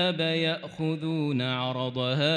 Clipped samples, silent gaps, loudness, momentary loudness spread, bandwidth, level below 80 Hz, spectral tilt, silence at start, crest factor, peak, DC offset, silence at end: under 0.1%; none; -28 LUFS; 5 LU; 9.8 kHz; -70 dBFS; -6.5 dB/octave; 0 s; 14 dB; -14 dBFS; under 0.1%; 0 s